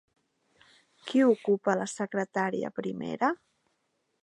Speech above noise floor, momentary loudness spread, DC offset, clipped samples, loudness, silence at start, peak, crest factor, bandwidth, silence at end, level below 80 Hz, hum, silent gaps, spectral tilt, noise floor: 49 dB; 11 LU; under 0.1%; under 0.1%; -29 LUFS; 1.05 s; -10 dBFS; 20 dB; 11.5 kHz; 0.9 s; -78 dBFS; none; none; -5.5 dB/octave; -77 dBFS